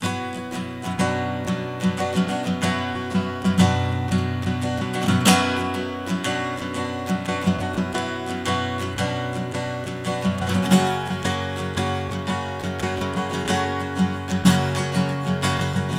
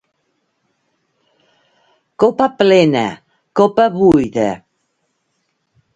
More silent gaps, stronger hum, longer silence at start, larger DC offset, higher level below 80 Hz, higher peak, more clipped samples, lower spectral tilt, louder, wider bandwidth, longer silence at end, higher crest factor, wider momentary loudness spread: neither; neither; second, 0 s vs 2.2 s; neither; about the same, -50 dBFS vs -50 dBFS; about the same, -2 dBFS vs 0 dBFS; neither; second, -5 dB/octave vs -6.5 dB/octave; second, -23 LUFS vs -14 LUFS; first, 16 kHz vs 9 kHz; second, 0 s vs 1.4 s; about the same, 20 dB vs 16 dB; second, 9 LU vs 12 LU